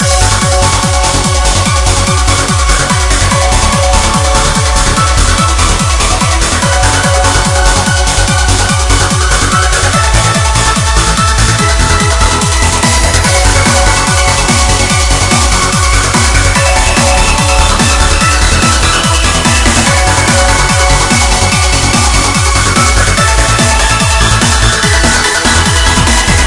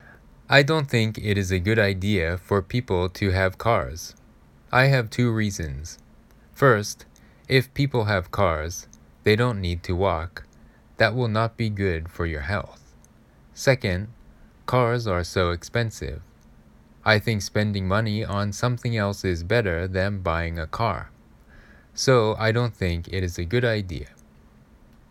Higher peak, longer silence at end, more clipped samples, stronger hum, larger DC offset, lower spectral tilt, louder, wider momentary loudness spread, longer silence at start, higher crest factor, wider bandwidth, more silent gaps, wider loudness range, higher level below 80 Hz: about the same, 0 dBFS vs -2 dBFS; second, 0 s vs 1.05 s; first, 0.6% vs under 0.1%; neither; neither; second, -3 dB/octave vs -5.5 dB/octave; first, -8 LUFS vs -24 LUFS; second, 2 LU vs 14 LU; second, 0 s vs 0.5 s; second, 8 dB vs 24 dB; second, 12 kHz vs 16 kHz; neither; about the same, 1 LU vs 3 LU; first, -14 dBFS vs -44 dBFS